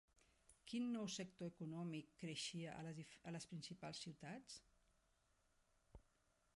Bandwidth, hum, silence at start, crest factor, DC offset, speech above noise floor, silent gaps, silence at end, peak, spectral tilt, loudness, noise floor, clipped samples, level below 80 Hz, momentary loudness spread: 11.5 kHz; none; 0.5 s; 18 dB; under 0.1%; 31 dB; none; 0.55 s; -36 dBFS; -4.5 dB/octave; -51 LUFS; -82 dBFS; under 0.1%; -80 dBFS; 10 LU